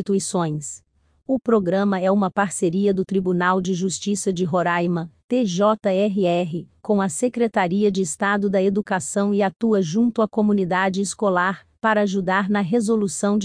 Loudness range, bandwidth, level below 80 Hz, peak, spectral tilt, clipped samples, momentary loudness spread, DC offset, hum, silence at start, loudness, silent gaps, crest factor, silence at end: 1 LU; 10.5 kHz; -60 dBFS; -6 dBFS; -5.5 dB/octave; under 0.1%; 5 LU; under 0.1%; none; 0 s; -21 LUFS; 5.24-5.28 s; 16 dB; 0 s